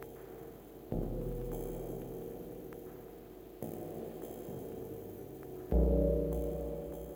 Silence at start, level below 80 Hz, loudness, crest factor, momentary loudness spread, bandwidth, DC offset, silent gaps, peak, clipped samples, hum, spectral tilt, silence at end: 0 s; -42 dBFS; -39 LUFS; 20 dB; 18 LU; over 20 kHz; under 0.1%; none; -18 dBFS; under 0.1%; none; -8.5 dB/octave; 0 s